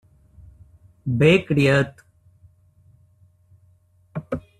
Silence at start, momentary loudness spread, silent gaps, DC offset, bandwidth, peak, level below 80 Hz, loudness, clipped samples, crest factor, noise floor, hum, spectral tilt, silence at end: 1.05 s; 19 LU; none; under 0.1%; 12.5 kHz; -2 dBFS; -52 dBFS; -20 LUFS; under 0.1%; 22 dB; -58 dBFS; none; -7 dB/octave; 0.2 s